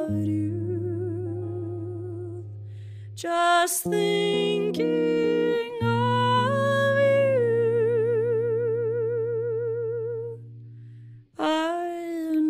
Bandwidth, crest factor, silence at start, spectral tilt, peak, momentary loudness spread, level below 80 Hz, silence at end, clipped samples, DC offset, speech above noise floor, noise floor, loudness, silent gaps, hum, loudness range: 15.5 kHz; 14 dB; 0 s; -5.5 dB/octave; -10 dBFS; 17 LU; -64 dBFS; 0 s; under 0.1%; under 0.1%; 23 dB; -46 dBFS; -25 LUFS; none; none; 7 LU